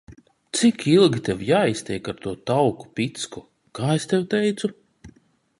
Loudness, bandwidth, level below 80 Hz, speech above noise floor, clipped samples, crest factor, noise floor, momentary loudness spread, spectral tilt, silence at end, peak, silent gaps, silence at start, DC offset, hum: -22 LUFS; 11.5 kHz; -56 dBFS; 35 dB; under 0.1%; 18 dB; -56 dBFS; 14 LU; -5.5 dB/octave; 0.5 s; -4 dBFS; none; 0.1 s; under 0.1%; none